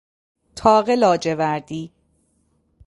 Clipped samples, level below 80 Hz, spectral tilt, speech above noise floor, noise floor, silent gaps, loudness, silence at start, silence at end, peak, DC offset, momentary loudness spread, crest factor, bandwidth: under 0.1%; -52 dBFS; -5.5 dB/octave; 47 dB; -65 dBFS; none; -18 LUFS; 0.55 s; 1 s; -2 dBFS; under 0.1%; 19 LU; 20 dB; 11.5 kHz